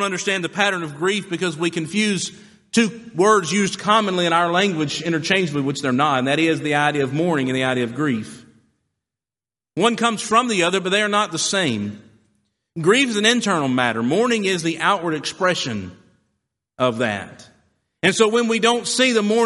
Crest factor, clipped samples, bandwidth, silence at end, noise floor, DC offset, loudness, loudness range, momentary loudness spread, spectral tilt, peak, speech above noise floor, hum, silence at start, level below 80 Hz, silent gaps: 18 dB; under 0.1%; 11.5 kHz; 0 s; under -90 dBFS; under 0.1%; -19 LUFS; 4 LU; 7 LU; -4 dB/octave; -2 dBFS; over 71 dB; none; 0 s; -64 dBFS; none